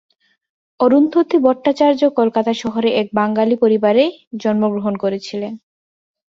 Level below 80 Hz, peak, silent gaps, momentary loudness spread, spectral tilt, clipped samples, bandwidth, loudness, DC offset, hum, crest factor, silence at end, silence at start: -62 dBFS; -2 dBFS; 4.27-4.31 s; 10 LU; -6.5 dB/octave; under 0.1%; 7.6 kHz; -16 LUFS; under 0.1%; none; 16 dB; 0.7 s; 0.8 s